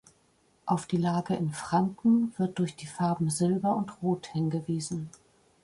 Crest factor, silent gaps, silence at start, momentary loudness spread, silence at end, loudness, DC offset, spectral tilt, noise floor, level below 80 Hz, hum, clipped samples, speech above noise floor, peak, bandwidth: 16 dB; none; 0.65 s; 8 LU; 0.55 s; -29 LUFS; under 0.1%; -6.5 dB/octave; -67 dBFS; -66 dBFS; none; under 0.1%; 38 dB; -14 dBFS; 11.5 kHz